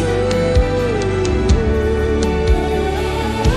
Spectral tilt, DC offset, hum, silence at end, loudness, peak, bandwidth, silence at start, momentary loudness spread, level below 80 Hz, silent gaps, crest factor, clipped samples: -6.5 dB/octave; under 0.1%; none; 0 s; -17 LUFS; -2 dBFS; 12.5 kHz; 0 s; 3 LU; -20 dBFS; none; 14 dB; under 0.1%